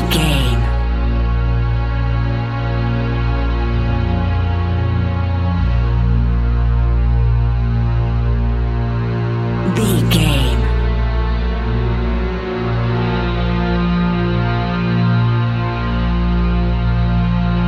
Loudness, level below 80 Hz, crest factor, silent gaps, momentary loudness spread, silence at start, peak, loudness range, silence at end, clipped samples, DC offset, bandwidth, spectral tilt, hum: -17 LUFS; -18 dBFS; 14 dB; none; 4 LU; 0 s; 0 dBFS; 2 LU; 0 s; under 0.1%; under 0.1%; 13.5 kHz; -7 dB/octave; none